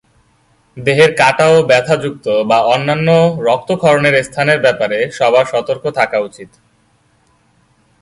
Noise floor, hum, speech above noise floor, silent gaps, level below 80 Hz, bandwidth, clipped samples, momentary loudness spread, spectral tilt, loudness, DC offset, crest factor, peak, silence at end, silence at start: -55 dBFS; none; 43 dB; none; -52 dBFS; 11.5 kHz; under 0.1%; 7 LU; -5 dB/octave; -12 LUFS; under 0.1%; 14 dB; 0 dBFS; 1.55 s; 0.75 s